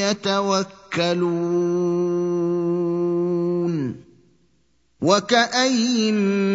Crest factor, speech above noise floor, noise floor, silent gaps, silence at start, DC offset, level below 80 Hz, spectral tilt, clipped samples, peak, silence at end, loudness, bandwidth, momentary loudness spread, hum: 20 dB; 45 dB; -65 dBFS; none; 0 s; under 0.1%; -66 dBFS; -5 dB/octave; under 0.1%; -2 dBFS; 0 s; -21 LUFS; 7.8 kHz; 6 LU; none